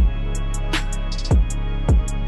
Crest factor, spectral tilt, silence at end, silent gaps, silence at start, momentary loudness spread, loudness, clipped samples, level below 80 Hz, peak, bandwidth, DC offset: 8 dB; -5.5 dB/octave; 0 s; none; 0 s; 7 LU; -23 LUFS; under 0.1%; -20 dBFS; -10 dBFS; 12 kHz; under 0.1%